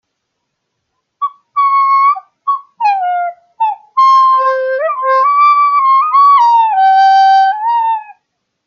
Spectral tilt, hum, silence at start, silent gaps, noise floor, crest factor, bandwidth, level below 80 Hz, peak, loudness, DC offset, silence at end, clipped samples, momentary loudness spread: 1.5 dB/octave; none; 1.2 s; none; -71 dBFS; 10 dB; 6.8 kHz; -82 dBFS; -2 dBFS; -10 LUFS; under 0.1%; 0.55 s; under 0.1%; 11 LU